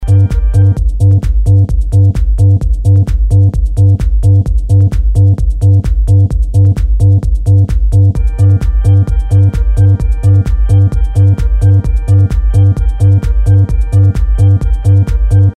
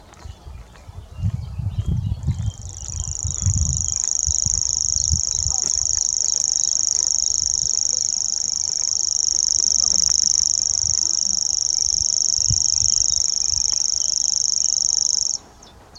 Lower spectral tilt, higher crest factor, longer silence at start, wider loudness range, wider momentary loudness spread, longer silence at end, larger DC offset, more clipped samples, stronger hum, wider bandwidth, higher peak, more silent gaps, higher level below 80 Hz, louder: first, -9 dB/octave vs -1 dB/octave; second, 8 dB vs 20 dB; about the same, 0 s vs 0 s; second, 0 LU vs 7 LU; second, 2 LU vs 10 LU; about the same, 0.05 s vs 0 s; neither; neither; neither; second, 8.8 kHz vs 17.5 kHz; about the same, 0 dBFS vs 0 dBFS; neither; first, -12 dBFS vs -36 dBFS; first, -10 LUFS vs -17 LUFS